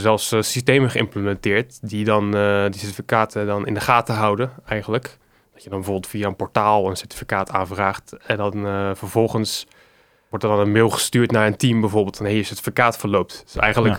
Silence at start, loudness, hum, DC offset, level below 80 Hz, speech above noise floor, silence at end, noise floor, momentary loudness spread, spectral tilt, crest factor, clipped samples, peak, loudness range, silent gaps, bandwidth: 0 s; -20 LUFS; none; under 0.1%; -48 dBFS; 36 dB; 0 s; -56 dBFS; 9 LU; -5 dB/octave; 20 dB; under 0.1%; 0 dBFS; 4 LU; none; 19 kHz